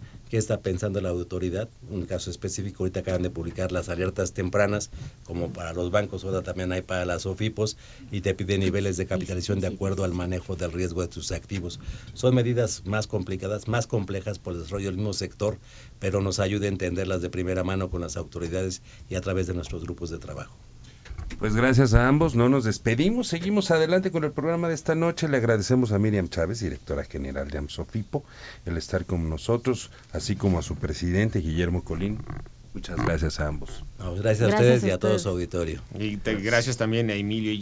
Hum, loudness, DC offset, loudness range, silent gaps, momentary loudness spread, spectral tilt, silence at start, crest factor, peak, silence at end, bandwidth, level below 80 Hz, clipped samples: none; -27 LUFS; under 0.1%; 7 LU; none; 12 LU; -6 dB/octave; 0 s; 24 dB; -2 dBFS; 0 s; 8 kHz; -40 dBFS; under 0.1%